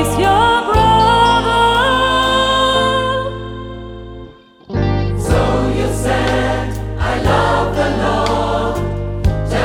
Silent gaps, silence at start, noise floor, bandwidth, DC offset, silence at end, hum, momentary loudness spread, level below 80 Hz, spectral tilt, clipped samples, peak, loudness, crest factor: none; 0 s; -37 dBFS; 16.5 kHz; under 0.1%; 0 s; none; 13 LU; -26 dBFS; -5 dB/octave; under 0.1%; 0 dBFS; -14 LUFS; 14 dB